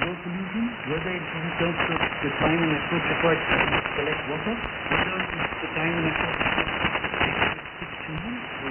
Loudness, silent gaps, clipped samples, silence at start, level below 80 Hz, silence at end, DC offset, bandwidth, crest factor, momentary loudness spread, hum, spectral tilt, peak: -25 LUFS; none; under 0.1%; 0 s; -46 dBFS; 0 s; under 0.1%; 3.7 kHz; 18 dB; 9 LU; none; -8.5 dB/octave; -8 dBFS